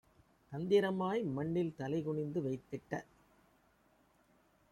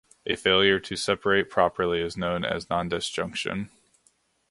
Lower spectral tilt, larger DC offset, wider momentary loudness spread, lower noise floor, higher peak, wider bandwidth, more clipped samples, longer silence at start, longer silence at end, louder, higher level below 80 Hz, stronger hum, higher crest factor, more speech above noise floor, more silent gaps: first, -7.5 dB/octave vs -4 dB/octave; neither; about the same, 12 LU vs 10 LU; first, -71 dBFS vs -67 dBFS; second, -18 dBFS vs -6 dBFS; about the same, 12 kHz vs 11.5 kHz; neither; first, 0.5 s vs 0.25 s; first, 1.7 s vs 0.85 s; second, -37 LUFS vs -25 LUFS; second, -72 dBFS vs -52 dBFS; neither; about the same, 20 dB vs 22 dB; second, 35 dB vs 41 dB; neither